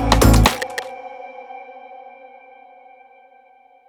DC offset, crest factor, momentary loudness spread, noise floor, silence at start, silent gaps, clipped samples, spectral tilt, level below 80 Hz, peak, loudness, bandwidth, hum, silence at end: under 0.1%; 20 dB; 27 LU; -51 dBFS; 0 s; none; under 0.1%; -5 dB/octave; -26 dBFS; 0 dBFS; -16 LUFS; over 20 kHz; none; 2.25 s